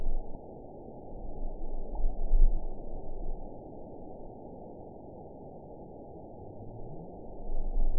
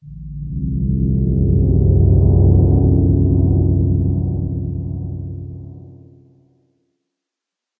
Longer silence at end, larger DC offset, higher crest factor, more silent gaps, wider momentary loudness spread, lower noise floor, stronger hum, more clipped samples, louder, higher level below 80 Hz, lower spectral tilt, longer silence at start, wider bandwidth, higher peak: second, 0 s vs 1.9 s; first, 0.2% vs under 0.1%; first, 20 dB vs 14 dB; neither; second, 13 LU vs 17 LU; second, -47 dBFS vs -84 dBFS; neither; neither; second, -42 LUFS vs -16 LUFS; second, -32 dBFS vs -22 dBFS; second, -14.5 dB/octave vs -17 dB/octave; about the same, 0 s vs 0.05 s; about the same, 1 kHz vs 1.1 kHz; second, -10 dBFS vs -2 dBFS